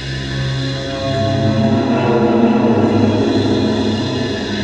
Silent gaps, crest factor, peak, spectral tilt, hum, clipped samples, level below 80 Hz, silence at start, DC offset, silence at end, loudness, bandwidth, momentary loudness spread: none; 14 dB; -2 dBFS; -7 dB/octave; none; under 0.1%; -38 dBFS; 0 s; 0.3%; 0 s; -15 LUFS; 9 kHz; 7 LU